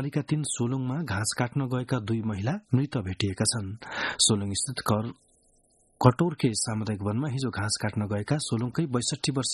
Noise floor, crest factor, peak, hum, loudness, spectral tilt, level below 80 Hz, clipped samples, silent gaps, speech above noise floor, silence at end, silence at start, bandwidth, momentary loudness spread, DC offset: -65 dBFS; 26 dB; -2 dBFS; none; -28 LUFS; -4.5 dB/octave; -58 dBFS; under 0.1%; none; 37 dB; 0 s; 0 s; 12 kHz; 8 LU; under 0.1%